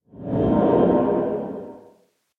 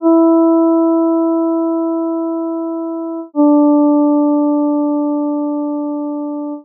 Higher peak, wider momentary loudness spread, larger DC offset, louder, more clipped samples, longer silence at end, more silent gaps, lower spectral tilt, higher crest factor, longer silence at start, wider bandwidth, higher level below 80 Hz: about the same, -6 dBFS vs -4 dBFS; first, 17 LU vs 11 LU; neither; second, -20 LUFS vs -15 LUFS; neither; first, 0.6 s vs 0 s; neither; first, -11 dB/octave vs 7 dB/octave; first, 16 dB vs 10 dB; first, 0.15 s vs 0 s; first, 4.2 kHz vs 1.4 kHz; first, -46 dBFS vs under -90 dBFS